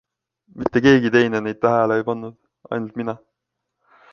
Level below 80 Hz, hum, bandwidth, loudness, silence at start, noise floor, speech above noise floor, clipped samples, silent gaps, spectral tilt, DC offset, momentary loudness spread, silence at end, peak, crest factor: -54 dBFS; none; 7 kHz; -19 LUFS; 0.55 s; -79 dBFS; 61 dB; under 0.1%; none; -6.5 dB/octave; under 0.1%; 15 LU; 0.95 s; -2 dBFS; 20 dB